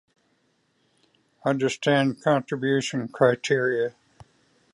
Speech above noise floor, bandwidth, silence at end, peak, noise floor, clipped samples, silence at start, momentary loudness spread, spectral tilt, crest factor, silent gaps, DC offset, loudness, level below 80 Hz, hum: 45 dB; 11.5 kHz; 0.85 s; -6 dBFS; -69 dBFS; under 0.1%; 1.45 s; 7 LU; -5.5 dB/octave; 20 dB; none; under 0.1%; -24 LUFS; -70 dBFS; none